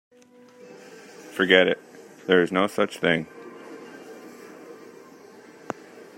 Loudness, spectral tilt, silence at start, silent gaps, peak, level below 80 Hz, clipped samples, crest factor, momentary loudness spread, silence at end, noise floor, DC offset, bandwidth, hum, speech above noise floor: -22 LUFS; -5 dB/octave; 0.7 s; none; -2 dBFS; -70 dBFS; under 0.1%; 24 dB; 26 LU; 1.45 s; -52 dBFS; under 0.1%; 16 kHz; none; 31 dB